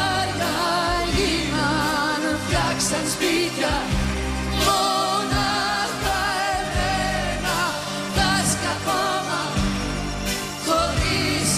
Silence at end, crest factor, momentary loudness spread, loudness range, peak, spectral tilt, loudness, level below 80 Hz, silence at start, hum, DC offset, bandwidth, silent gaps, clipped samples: 0 s; 14 dB; 5 LU; 1 LU; -8 dBFS; -3.5 dB/octave; -22 LUFS; -34 dBFS; 0 s; none; under 0.1%; 15.5 kHz; none; under 0.1%